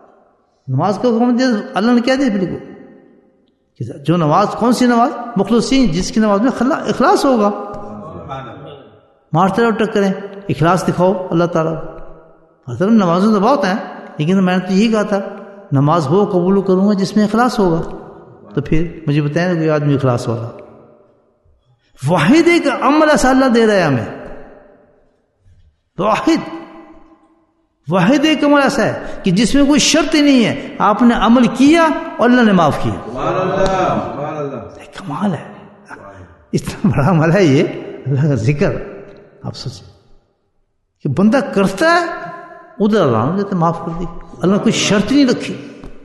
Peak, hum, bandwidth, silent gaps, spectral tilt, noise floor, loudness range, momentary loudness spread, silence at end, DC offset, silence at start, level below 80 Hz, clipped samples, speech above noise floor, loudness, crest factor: 0 dBFS; none; 12.5 kHz; none; -6 dB/octave; -62 dBFS; 7 LU; 18 LU; 0 s; under 0.1%; 0.65 s; -38 dBFS; under 0.1%; 49 dB; -14 LUFS; 14 dB